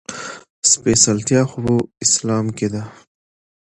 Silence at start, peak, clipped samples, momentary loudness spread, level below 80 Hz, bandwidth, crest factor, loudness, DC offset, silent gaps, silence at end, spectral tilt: 0.1 s; 0 dBFS; under 0.1%; 17 LU; -48 dBFS; 11.5 kHz; 20 dB; -16 LUFS; under 0.1%; 0.50-0.62 s; 0.7 s; -3.5 dB/octave